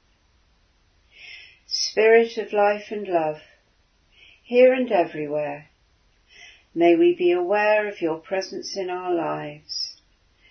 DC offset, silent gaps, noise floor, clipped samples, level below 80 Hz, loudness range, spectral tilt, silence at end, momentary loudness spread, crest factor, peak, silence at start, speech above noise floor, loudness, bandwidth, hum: under 0.1%; none; -63 dBFS; under 0.1%; -66 dBFS; 3 LU; -4 dB/octave; 0.6 s; 15 LU; 20 dB; -4 dBFS; 1.2 s; 42 dB; -22 LUFS; 6.6 kHz; none